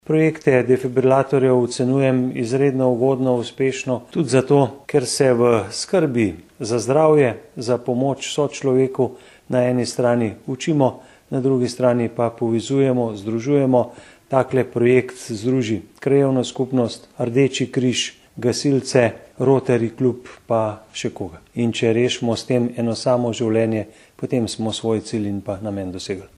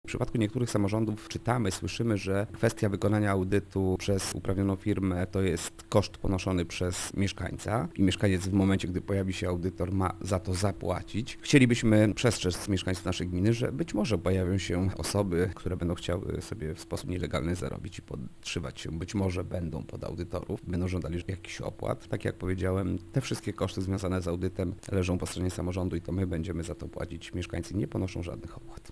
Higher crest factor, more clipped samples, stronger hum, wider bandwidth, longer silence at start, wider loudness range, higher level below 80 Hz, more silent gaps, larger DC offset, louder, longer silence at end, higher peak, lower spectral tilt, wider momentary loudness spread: second, 18 dB vs 24 dB; neither; neither; first, 12.5 kHz vs 11 kHz; about the same, 0.1 s vs 0.05 s; second, 3 LU vs 7 LU; second, -58 dBFS vs -48 dBFS; neither; neither; first, -20 LUFS vs -31 LUFS; about the same, 0.1 s vs 0 s; first, 0 dBFS vs -6 dBFS; about the same, -6 dB/octave vs -6 dB/octave; about the same, 9 LU vs 10 LU